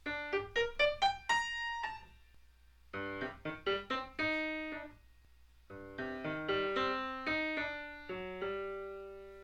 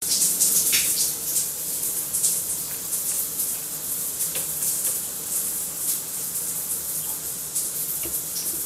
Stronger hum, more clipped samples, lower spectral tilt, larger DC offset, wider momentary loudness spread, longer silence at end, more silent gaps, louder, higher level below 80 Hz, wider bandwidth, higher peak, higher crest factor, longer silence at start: neither; neither; first, -3.5 dB/octave vs 0.5 dB/octave; neither; first, 15 LU vs 8 LU; about the same, 0 s vs 0 s; neither; second, -37 LUFS vs -23 LUFS; about the same, -60 dBFS vs -58 dBFS; second, 12 kHz vs 16 kHz; second, -18 dBFS vs -6 dBFS; about the same, 20 dB vs 20 dB; about the same, 0.05 s vs 0 s